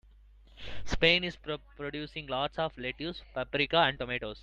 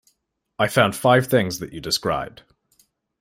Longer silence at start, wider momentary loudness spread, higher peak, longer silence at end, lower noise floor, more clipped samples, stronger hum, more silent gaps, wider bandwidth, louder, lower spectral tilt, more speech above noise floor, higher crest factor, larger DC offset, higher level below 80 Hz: about the same, 0.55 s vs 0.6 s; first, 15 LU vs 11 LU; second, -8 dBFS vs -2 dBFS; second, 0 s vs 0.9 s; second, -57 dBFS vs -72 dBFS; neither; neither; neither; second, 8.8 kHz vs 16 kHz; second, -31 LUFS vs -20 LUFS; about the same, -4.5 dB/octave vs -4.5 dB/octave; second, 25 dB vs 52 dB; about the same, 24 dB vs 20 dB; neither; first, -48 dBFS vs -54 dBFS